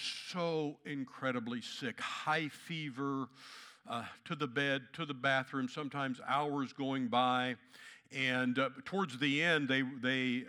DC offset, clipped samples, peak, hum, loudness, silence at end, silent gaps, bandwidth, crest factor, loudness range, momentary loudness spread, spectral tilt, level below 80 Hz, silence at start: under 0.1%; under 0.1%; -18 dBFS; none; -36 LUFS; 0 s; none; 13 kHz; 20 dB; 5 LU; 11 LU; -5 dB/octave; -88 dBFS; 0 s